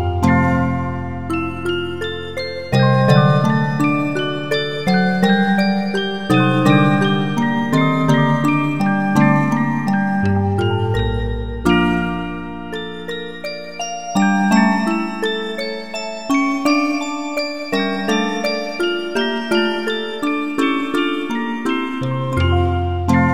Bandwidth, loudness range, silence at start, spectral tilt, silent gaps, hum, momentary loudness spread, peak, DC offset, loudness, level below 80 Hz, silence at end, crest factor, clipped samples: 15.5 kHz; 4 LU; 0 s; -6.5 dB/octave; none; none; 11 LU; 0 dBFS; 2%; -18 LUFS; -38 dBFS; 0 s; 18 dB; under 0.1%